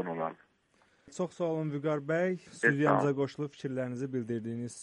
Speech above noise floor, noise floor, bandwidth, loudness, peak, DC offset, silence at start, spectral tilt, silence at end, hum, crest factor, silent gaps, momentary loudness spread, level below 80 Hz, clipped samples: 37 dB; -69 dBFS; 11 kHz; -32 LUFS; -12 dBFS; under 0.1%; 0 s; -6.5 dB/octave; 0 s; none; 22 dB; none; 11 LU; -74 dBFS; under 0.1%